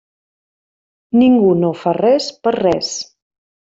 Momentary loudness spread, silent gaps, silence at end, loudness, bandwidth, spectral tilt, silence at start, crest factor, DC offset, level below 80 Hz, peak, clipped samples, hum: 11 LU; none; 0.65 s; -15 LUFS; 7.8 kHz; -5.5 dB/octave; 1.15 s; 14 dB; under 0.1%; -54 dBFS; -2 dBFS; under 0.1%; none